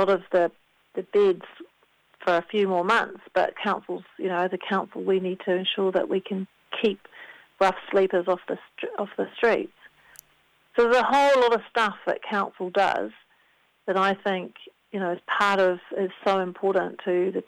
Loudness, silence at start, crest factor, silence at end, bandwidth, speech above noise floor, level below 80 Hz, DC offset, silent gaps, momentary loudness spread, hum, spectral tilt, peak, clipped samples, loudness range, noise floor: -25 LUFS; 0 s; 18 dB; 0.05 s; 13.5 kHz; 40 dB; -68 dBFS; under 0.1%; none; 12 LU; none; -5.5 dB/octave; -8 dBFS; under 0.1%; 4 LU; -64 dBFS